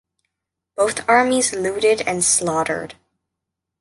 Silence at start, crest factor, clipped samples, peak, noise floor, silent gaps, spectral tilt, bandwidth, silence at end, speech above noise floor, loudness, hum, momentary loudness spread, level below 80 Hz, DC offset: 0.8 s; 18 dB; under 0.1%; -2 dBFS; -82 dBFS; none; -2.5 dB/octave; 12 kHz; 0.9 s; 63 dB; -18 LUFS; none; 11 LU; -56 dBFS; under 0.1%